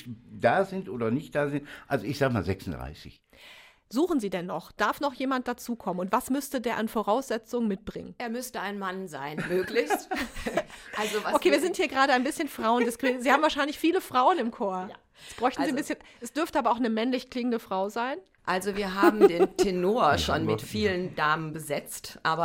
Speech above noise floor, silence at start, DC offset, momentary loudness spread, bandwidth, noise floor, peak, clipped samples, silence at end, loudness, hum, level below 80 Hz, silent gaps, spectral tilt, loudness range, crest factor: 25 dB; 0 s; under 0.1%; 12 LU; 16.5 kHz; -52 dBFS; -6 dBFS; under 0.1%; 0 s; -28 LUFS; none; -54 dBFS; none; -5 dB/octave; 6 LU; 22 dB